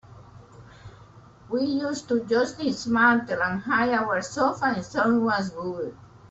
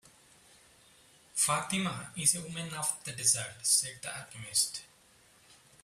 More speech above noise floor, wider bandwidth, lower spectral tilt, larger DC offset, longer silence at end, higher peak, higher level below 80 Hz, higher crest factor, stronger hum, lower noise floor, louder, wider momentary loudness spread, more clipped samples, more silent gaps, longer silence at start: about the same, 26 dB vs 29 dB; second, 8.2 kHz vs 16 kHz; first, -5 dB/octave vs -1.5 dB/octave; neither; second, 0 s vs 1 s; about the same, -8 dBFS vs -10 dBFS; first, -60 dBFS vs -70 dBFS; second, 18 dB vs 24 dB; neither; second, -50 dBFS vs -62 dBFS; first, -24 LUFS vs -30 LUFS; about the same, 11 LU vs 12 LU; neither; neither; second, 0.1 s vs 1.35 s